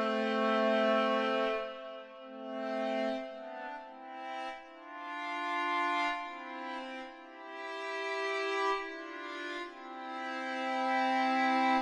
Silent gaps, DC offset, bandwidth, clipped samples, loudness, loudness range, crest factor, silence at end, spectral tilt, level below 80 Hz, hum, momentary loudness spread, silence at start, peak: none; under 0.1%; 11 kHz; under 0.1%; -34 LUFS; 6 LU; 16 dB; 0 s; -4 dB/octave; -78 dBFS; none; 16 LU; 0 s; -18 dBFS